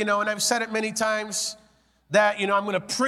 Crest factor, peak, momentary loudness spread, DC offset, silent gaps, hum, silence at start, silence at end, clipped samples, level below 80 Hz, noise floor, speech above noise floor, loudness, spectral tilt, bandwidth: 18 dB; -6 dBFS; 7 LU; under 0.1%; none; none; 0 s; 0 s; under 0.1%; -68 dBFS; -61 dBFS; 37 dB; -24 LUFS; -2.5 dB/octave; 16 kHz